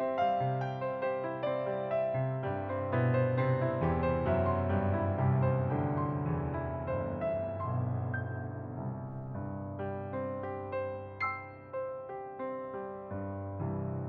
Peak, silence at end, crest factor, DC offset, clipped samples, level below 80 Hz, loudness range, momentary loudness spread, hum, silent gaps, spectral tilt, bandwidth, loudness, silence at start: -18 dBFS; 0 s; 16 dB; under 0.1%; under 0.1%; -54 dBFS; 8 LU; 10 LU; none; none; -8 dB/octave; 4.6 kHz; -34 LUFS; 0 s